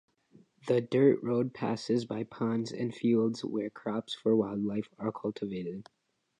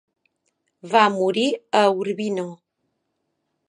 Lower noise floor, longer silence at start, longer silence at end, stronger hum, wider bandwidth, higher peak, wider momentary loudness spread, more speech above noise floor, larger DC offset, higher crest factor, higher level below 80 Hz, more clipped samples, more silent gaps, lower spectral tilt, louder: second, -63 dBFS vs -75 dBFS; second, 0.65 s vs 0.85 s; second, 0.55 s vs 1.15 s; neither; about the same, 10.5 kHz vs 11 kHz; second, -12 dBFS vs -2 dBFS; about the same, 11 LU vs 9 LU; second, 32 dB vs 55 dB; neither; about the same, 18 dB vs 22 dB; first, -72 dBFS vs -78 dBFS; neither; neither; first, -7 dB/octave vs -4.5 dB/octave; second, -31 LUFS vs -20 LUFS